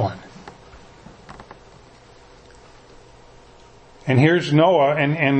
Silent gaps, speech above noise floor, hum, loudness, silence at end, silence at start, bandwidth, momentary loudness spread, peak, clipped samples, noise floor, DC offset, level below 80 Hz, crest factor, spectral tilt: none; 31 dB; none; -17 LUFS; 0 s; 0 s; 8.6 kHz; 27 LU; -2 dBFS; under 0.1%; -47 dBFS; under 0.1%; -54 dBFS; 20 dB; -7.5 dB/octave